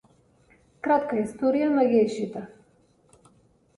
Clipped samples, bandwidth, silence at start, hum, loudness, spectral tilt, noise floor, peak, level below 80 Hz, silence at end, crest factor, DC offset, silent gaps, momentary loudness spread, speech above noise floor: under 0.1%; 11.5 kHz; 0.85 s; none; -24 LUFS; -6.5 dB/octave; -62 dBFS; -10 dBFS; -66 dBFS; 1.3 s; 18 dB; under 0.1%; none; 14 LU; 38 dB